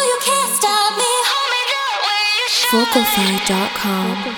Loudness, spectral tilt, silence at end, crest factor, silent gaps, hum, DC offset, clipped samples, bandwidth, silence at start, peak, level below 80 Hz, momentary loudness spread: -15 LUFS; -2 dB/octave; 0 s; 16 dB; none; none; under 0.1%; under 0.1%; over 20 kHz; 0 s; -2 dBFS; -54 dBFS; 4 LU